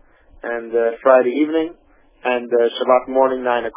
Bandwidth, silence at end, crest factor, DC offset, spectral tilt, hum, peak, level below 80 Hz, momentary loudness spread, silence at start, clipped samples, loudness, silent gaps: 3.7 kHz; 0.05 s; 18 dB; under 0.1%; -8 dB/octave; none; 0 dBFS; -56 dBFS; 13 LU; 0.45 s; under 0.1%; -18 LUFS; none